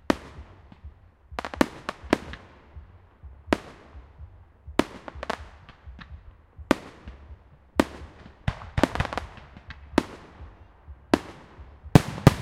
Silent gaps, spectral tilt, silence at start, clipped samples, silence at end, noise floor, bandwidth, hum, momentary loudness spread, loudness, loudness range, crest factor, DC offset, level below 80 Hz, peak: none; -6.5 dB/octave; 0.1 s; under 0.1%; 0 s; -49 dBFS; 16 kHz; none; 23 LU; -27 LUFS; 4 LU; 30 dB; under 0.1%; -42 dBFS; 0 dBFS